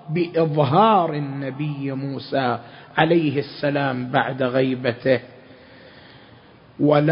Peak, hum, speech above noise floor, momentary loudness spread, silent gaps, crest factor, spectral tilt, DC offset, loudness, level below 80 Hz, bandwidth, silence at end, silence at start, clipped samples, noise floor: 0 dBFS; none; 28 dB; 11 LU; none; 22 dB; -11.5 dB/octave; under 0.1%; -21 LUFS; -62 dBFS; 5.4 kHz; 0 s; 0.05 s; under 0.1%; -48 dBFS